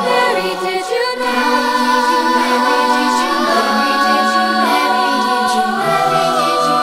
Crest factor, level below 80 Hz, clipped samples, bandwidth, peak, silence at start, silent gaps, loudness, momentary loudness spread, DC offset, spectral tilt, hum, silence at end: 12 dB; -56 dBFS; under 0.1%; 16 kHz; -2 dBFS; 0 s; none; -14 LUFS; 3 LU; under 0.1%; -3 dB/octave; none; 0 s